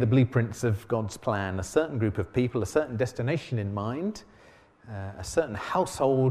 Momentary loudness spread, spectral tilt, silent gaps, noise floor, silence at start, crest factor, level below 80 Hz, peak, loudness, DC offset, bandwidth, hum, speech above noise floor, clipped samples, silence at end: 9 LU; -7 dB/octave; none; -56 dBFS; 0 s; 18 dB; -52 dBFS; -10 dBFS; -28 LUFS; under 0.1%; 14 kHz; none; 29 dB; under 0.1%; 0 s